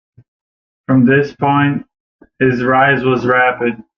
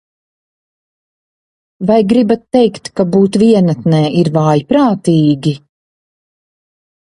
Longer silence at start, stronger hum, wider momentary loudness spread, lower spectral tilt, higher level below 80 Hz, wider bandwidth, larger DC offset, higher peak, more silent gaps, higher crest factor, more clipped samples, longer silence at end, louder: second, 0.9 s vs 1.8 s; neither; about the same, 7 LU vs 7 LU; about the same, -8.5 dB/octave vs -7.5 dB/octave; about the same, -52 dBFS vs -52 dBFS; second, 6.4 kHz vs 11.5 kHz; neither; about the same, -2 dBFS vs 0 dBFS; first, 2.00-2.19 s vs none; about the same, 14 dB vs 14 dB; neither; second, 0.15 s vs 1.65 s; about the same, -13 LUFS vs -12 LUFS